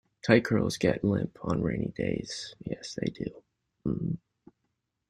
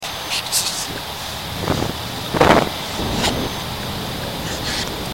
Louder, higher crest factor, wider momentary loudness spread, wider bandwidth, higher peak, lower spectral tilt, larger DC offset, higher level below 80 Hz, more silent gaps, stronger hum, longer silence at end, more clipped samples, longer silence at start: second, -30 LUFS vs -21 LUFS; about the same, 24 dB vs 22 dB; first, 14 LU vs 11 LU; second, 13.5 kHz vs 16.5 kHz; second, -6 dBFS vs 0 dBFS; first, -6 dB/octave vs -3.5 dB/octave; second, under 0.1% vs 0.3%; second, -54 dBFS vs -36 dBFS; neither; neither; first, 0.95 s vs 0 s; neither; first, 0.25 s vs 0 s